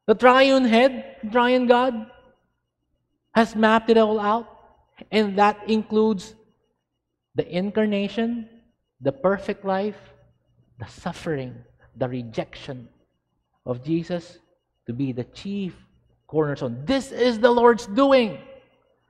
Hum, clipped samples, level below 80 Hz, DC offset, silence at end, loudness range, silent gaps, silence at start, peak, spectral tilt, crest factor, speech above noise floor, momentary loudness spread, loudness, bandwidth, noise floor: none; under 0.1%; -58 dBFS; under 0.1%; 0.55 s; 10 LU; none; 0.1 s; 0 dBFS; -6 dB/octave; 22 dB; 58 dB; 18 LU; -22 LUFS; 11 kHz; -79 dBFS